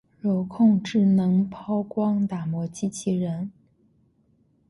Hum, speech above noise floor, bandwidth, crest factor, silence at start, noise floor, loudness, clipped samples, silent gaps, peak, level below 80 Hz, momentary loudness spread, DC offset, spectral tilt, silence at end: none; 41 dB; 11.5 kHz; 16 dB; 0.25 s; -64 dBFS; -24 LUFS; under 0.1%; none; -8 dBFS; -62 dBFS; 10 LU; under 0.1%; -7.5 dB/octave; 1.2 s